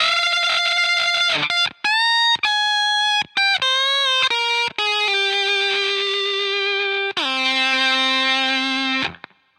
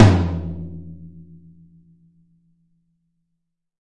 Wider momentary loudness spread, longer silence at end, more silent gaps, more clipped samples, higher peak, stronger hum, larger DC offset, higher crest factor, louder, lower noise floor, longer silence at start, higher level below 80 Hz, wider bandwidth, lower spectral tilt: second, 4 LU vs 26 LU; second, 0.45 s vs 2.75 s; neither; neither; second, -6 dBFS vs 0 dBFS; neither; neither; second, 14 dB vs 22 dB; first, -17 LUFS vs -21 LUFS; second, -41 dBFS vs -75 dBFS; about the same, 0 s vs 0 s; second, -68 dBFS vs -44 dBFS; first, 14 kHz vs 9.4 kHz; second, -0.5 dB/octave vs -7.5 dB/octave